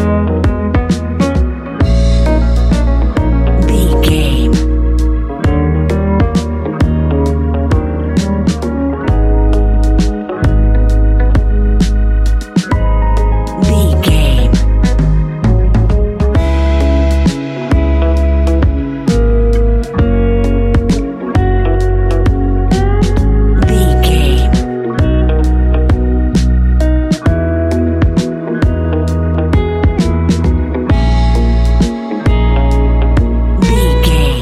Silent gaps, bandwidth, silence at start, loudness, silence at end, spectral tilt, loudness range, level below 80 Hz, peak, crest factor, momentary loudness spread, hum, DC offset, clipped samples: none; 13 kHz; 0 s; -13 LUFS; 0 s; -7 dB/octave; 1 LU; -12 dBFS; 0 dBFS; 10 dB; 4 LU; none; under 0.1%; under 0.1%